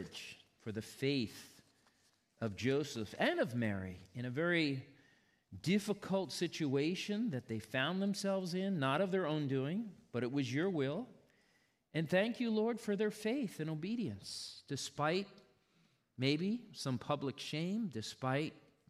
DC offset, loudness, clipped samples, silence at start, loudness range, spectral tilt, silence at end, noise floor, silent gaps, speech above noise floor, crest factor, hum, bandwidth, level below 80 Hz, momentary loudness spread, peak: under 0.1%; -38 LUFS; under 0.1%; 0 s; 3 LU; -5.5 dB/octave; 0.3 s; -75 dBFS; none; 38 dB; 18 dB; none; 15 kHz; -78 dBFS; 10 LU; -20 dBFS